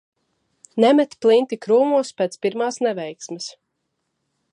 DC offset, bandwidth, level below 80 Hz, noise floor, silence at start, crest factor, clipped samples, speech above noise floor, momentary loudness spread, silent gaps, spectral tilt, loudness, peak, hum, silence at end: under 0.1%; 11 kHz; -78 dBFS; -75 dBFS; 0.75 s; 20 dB; under 0.1%; 56 dB; 15 LU; none; -4.5 dB/octave; -19 LUFS; -2 dBFS; none; 1 s